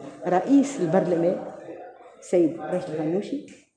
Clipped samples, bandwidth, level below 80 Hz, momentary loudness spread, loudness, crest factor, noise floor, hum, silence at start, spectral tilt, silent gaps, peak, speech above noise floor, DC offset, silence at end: under 0.1%; 9.8 kHz; -72 dBFS; 19 LU; -24 LUFS; 18 dB; -44 dBFS; none; 0 s; -7 dB/octave; none; -6 dBFS; 20 dB; under 0.1%; 0.2 s